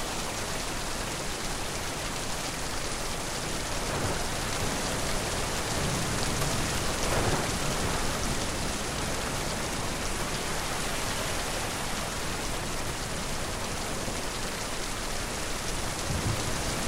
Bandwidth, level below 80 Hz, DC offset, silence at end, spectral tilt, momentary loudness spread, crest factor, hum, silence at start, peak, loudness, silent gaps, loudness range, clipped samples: 16 kHz; -38 dBFS; under 0.1%; 0 s; -3 dB/octave; 4 LU; 16 dB; none; 0 s; -14 dBFS; -31 LUFS; none; 3 LU; under 0.1%